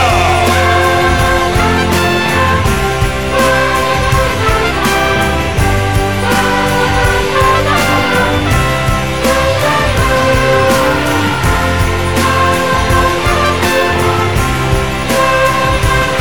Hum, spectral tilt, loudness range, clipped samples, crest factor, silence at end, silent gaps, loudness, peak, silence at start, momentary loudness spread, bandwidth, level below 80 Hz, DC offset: none; -4.5 dB/octave; 1 LU; under 0.1%; 12 dB; 0 s; none; -11 LUFS; 0 dBFS; 0 s; 3 LU; 19.5 kHz; -22 dBFS; 3%